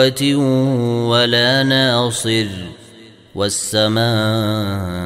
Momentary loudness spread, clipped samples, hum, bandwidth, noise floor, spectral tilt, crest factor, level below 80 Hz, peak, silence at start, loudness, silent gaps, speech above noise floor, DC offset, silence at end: 9 LU; under 0.1%; none; 16 kHz; -42 dBFS; -4.5 dB/octave; 16 dB; -52 dBFS; 0 dBFS; 0 s; -16 LUFS; none; 26 dB; under 0.1%; 0 s